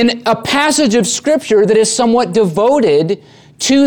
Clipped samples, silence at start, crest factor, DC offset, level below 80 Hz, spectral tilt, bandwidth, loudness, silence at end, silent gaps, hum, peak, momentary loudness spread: under 0.1%; 0 s; 10 dB; under 0.1%; -50 dBFS; -4 dB/octave; 19.5 kHz; -12 LUFS; 0 s; none; none; -2 dBFS; 5 LU